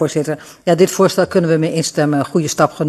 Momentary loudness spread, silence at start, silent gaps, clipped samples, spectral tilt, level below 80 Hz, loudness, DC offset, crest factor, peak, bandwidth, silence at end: 7 LU; 0 s; none; under 0.1%; -5.5 dB/octave; -56 dBFS; -15 LUFS; under 0.1%; 14 dB; 0 dBFS; 13.5 kHz; 0 s